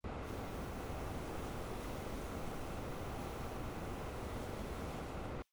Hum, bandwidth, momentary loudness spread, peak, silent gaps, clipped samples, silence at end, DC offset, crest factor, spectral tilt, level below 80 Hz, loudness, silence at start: none; over 20 kHz; 1 LU; -30 dBFS; none; under 0.1%; 0.1 s; under 0.1%; 12 dB; -5.5 dB/octave; -50 dBFS; -45 LUFS; 0.05 s